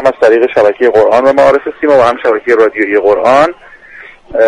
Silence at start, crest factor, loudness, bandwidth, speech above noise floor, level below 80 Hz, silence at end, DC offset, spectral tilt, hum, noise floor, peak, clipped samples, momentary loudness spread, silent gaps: 0 s; 8 dB; -9 LUFS; 10.5 kHz; 26 dB; -44 dBFS; 0 s; under 0.1%; -5.5 dB/octave; none; -34 dBFS; 0 dBFS; 0.3%; 4 LU; none